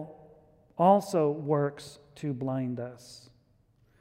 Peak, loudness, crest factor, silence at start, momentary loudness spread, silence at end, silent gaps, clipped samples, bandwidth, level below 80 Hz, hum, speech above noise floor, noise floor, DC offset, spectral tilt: -10 dBFS; -28 LUFS; 20 dB; 0 s; 23 LU; 0.8 s; none; under 0.1%; 16 kHz; -70 dBFS; none; 38 dB; -66 dBFS; under 0.1%; -7.5 dB/octave